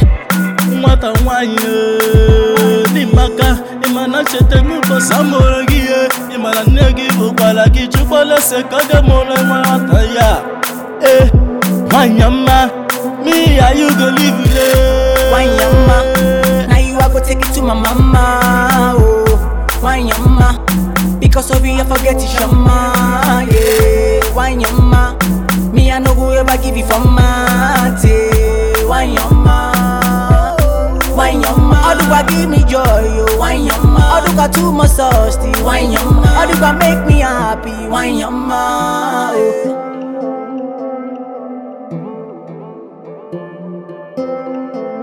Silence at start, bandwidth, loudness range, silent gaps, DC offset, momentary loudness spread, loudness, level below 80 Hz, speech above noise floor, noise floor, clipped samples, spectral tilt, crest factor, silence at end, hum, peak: 0 s; over 20 kHz; 6 LU; none; under 0.1%; 12 LU; -11 LUFS; -16 dBFS; 22 dB; -31 dBFS; under 0.1%; -5.5 dB/octave; 10 dB; 0 s; none; 0 dBFS